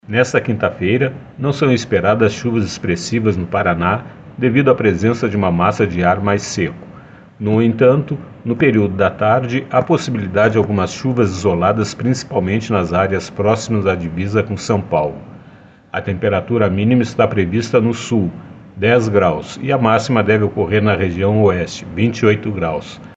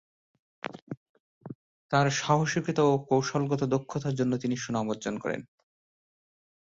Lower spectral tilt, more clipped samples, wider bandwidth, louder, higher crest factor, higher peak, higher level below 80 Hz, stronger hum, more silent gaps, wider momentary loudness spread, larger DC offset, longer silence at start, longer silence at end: about the same, -6.5 dB/octave vs -5.5 dB/octave; neither; about the same, 8.2 kHz vs 7.8 kHz; first, -16 LUFS vs -28 LUFS; second, 16 dB vs 22 dB; first, 0 dBFS vs -8 dBFS; first, -44 dBFS vs -66 dBFS; neither; second, none vs 0.82-0.87 s, 0.97-1.41 s, 1.55-1.89 s; second, 8 LU vs 19 LU; neither; second, 0.1 s vs 0.75 s; second, 0.05 s vs 1.3 s